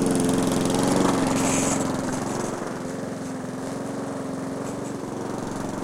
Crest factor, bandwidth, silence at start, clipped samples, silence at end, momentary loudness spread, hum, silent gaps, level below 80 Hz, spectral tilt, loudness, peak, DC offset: 18 dB; 16.5 kHz; 0 s; under 0.1%; 0 s; 10 LU; none; none; -48 dBFS; -5 dB/octave; -26 LUFS; -8 dBFS; under 0.1%